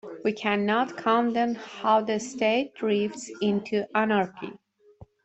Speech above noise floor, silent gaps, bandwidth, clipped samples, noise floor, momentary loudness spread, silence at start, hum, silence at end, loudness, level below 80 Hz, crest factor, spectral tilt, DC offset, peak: 27 dB; none; 8.2 kHz; under 0.1%; -53 dBFS; 7 LU; 0.05 s; none; 0.2 s; -26 LUFS; -68 dBFS; 18 dB; -5 dB/octave; under 0.1%; -8 dBFS